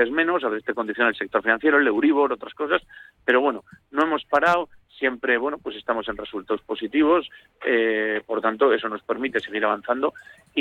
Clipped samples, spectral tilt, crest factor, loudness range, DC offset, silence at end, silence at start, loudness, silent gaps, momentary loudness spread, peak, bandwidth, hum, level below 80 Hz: under 0.1%; -5.5 dB/octave; 16 dB; 3 LU; under 0.1%; 0 s; 0 s; -23 LUFS; none; 9 LU; -6 dBFS; 8.2 kHz; none; -60 dBFS